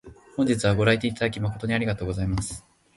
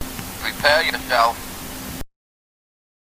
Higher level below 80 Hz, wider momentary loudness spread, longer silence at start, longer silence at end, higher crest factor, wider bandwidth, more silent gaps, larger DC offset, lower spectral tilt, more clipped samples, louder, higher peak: about the same, -42 dBFS vs -42 dBFS; second, 11 LU vs 15 LU; about the same, 0.05 s vs 0 s; second, 0.35 s vs 0.95 s; about the same, 20 dB vs 24 dB; second, 11.5 kHz vs 16 kHz; neither; neither; first, -5.5 dB/octave vs -2.5 dB/octave; neither; second, -25 LUFS vs -20 LUFS; second, -6 dBFS vs 0 dBFS